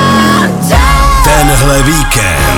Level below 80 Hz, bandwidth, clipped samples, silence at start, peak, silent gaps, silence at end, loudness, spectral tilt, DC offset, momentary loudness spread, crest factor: -12 dBFS; 18.5 kHz; 0.9%; 0 s; 0 dBFS; none; 0 s; -7 LUFS; -4 dB/octave; under 0.1%; 2 LU; 6 dB